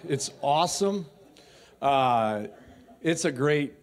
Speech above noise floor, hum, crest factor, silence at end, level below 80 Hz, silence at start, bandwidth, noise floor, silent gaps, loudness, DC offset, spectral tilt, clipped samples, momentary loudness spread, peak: 28 dB; none; 16 dB; 0.1 s; -64 dBFS; 0.05 s; 15.5 kHz; -54 dBFS; none; -26 LUFS; under 0.1%; -4.5 dB/octave; under 0.1%; 11 LU; -10 dBFS